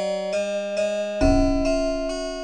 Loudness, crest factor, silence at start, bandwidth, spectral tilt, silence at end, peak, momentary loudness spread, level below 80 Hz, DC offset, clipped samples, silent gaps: -23 LUFS; 16 dB; 0 s; 10 kHz; -5.5 dB/octave; 0 s; -8 dBFS; 6 LU; -30 dBFS; under 0.1%; under 0.1%; none